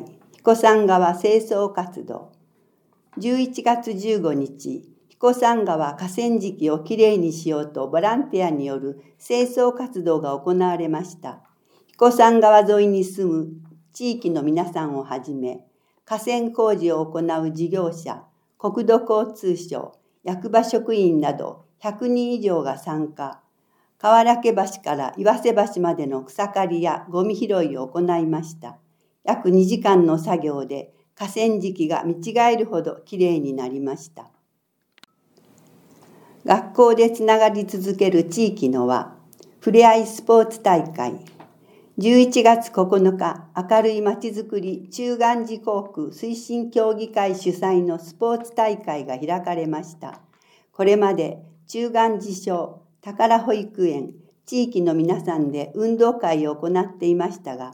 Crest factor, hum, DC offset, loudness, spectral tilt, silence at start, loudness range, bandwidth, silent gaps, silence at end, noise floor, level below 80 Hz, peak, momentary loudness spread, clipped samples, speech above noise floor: 20 dB; none; under 0.1%; -20 LUFS; -6 dB/octave; 0 s; 6 LU; 18.5 kHz; none; 0 s; -72 dBFS; -82 dBFS; 0 dBFS; 15 LU; under 0.1%; 52 dB